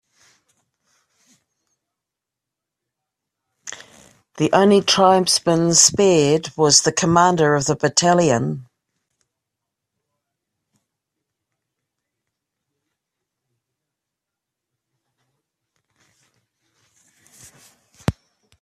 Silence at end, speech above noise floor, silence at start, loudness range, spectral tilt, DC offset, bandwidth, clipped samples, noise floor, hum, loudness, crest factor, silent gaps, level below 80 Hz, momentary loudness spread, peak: 0.5 s; 69 dB; 3.65 s; 17 LU; -3.5 dB/octave; under 0.1%; 14 kHz; under 0.1%; -85 dBFS; none; -16 LUFS; 22 dB; none; -54 dBFS; 15 LU; 0 dBFS